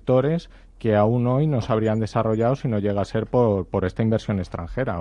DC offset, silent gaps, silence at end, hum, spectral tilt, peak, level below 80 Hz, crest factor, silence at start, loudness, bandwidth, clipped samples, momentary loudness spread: under 0.1%; none; 0 s; none; -8.5 dB/octave; -6 dBFS; -44 dBFS; 16 dB; 0.05 s; -22 LUFS; 9.2 kHz; under 0.1%; 7 LU